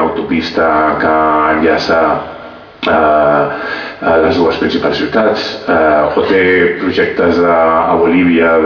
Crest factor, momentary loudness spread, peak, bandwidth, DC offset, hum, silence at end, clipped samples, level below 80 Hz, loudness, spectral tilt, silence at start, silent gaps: 10 dB; 7 LU; 0 dBFS; 5.4 kHz; under 0.1%; none; 0 s; under 0.1%; -40 dBFS; -11 LUFS; -6.5 dB/octave; 0 s; none